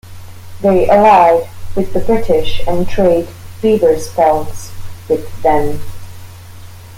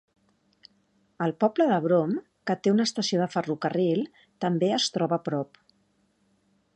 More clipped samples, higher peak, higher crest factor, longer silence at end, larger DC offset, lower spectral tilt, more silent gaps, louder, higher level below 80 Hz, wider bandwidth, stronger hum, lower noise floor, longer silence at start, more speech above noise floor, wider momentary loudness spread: neither; first, 0 dBFS vs -10 dBFS; second, 12 dB vs 18 dB; second, 0 s vs 1.3 s; neither; about the same, -6 dB/octave vs -5.5 dB/octave; neither; first, -13 LUFS vs -26 LUFS; first, -30 dBFS vs -76 dBFS; first, 16.5 kHz vs 9.8 kHz; neither; second, -32 dBFS vs -69 dBFS; second, 0.05 s vs 1.2 s; second, 21 dB vs 43 dB; first, 20 LU vs 8 LU